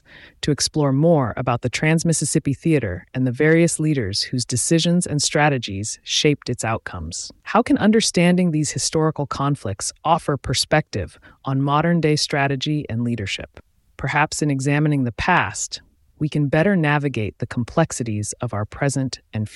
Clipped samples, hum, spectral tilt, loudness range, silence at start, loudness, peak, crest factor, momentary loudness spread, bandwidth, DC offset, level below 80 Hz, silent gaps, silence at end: under 0.1%; none; -4.5 dB/octave; 3 LU; 0.15 s; -20 LUFS; -2 dBFS; 18 dB; 10 LU; 12 kHz; under 0.1%; -48 dBFS; none; 0 s